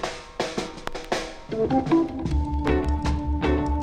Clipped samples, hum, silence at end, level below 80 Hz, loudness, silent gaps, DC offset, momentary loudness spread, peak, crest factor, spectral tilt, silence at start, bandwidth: under 0.1%; none; 0 s; -30 dBFS; -26 LUFS; none; under 0.1%; 10 LU; -8 dBFS; 16 dB; -6.5 dB/octave; 0 s; 10.5 kHz